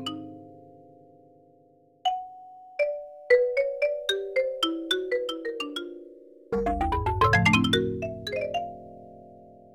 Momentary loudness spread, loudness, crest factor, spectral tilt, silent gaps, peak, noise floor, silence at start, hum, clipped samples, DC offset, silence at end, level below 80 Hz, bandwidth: 21 LU; -26 LUFS; 20 dB; -5 dB/octave; none; -8 dBFS; -60 dBFS; 0 s; none; under 0.1%; under 0.1%; 0.2 s; -46 dBFS; 18.5 kHz